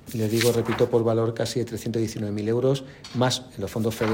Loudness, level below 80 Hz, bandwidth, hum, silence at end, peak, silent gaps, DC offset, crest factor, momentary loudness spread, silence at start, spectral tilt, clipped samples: -25 LUFS; -56 dBFS; 16.5 kHz; none; 0 s; -4 dBFS; none; under 0.1%; 20 dB; 7 LU; 0.05 s; -5.5 dB/octave; under 0.1%